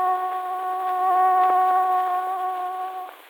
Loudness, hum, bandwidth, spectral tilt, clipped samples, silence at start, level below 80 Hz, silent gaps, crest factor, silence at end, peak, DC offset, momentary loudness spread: -22 LUFS; none; 18.5 kHz; -2 dB/octave; under 0.1%; 0 s; -80 dBFS; none; 12 dB; 0.15 s; -10 dBFS; under 0.1%; 10 LU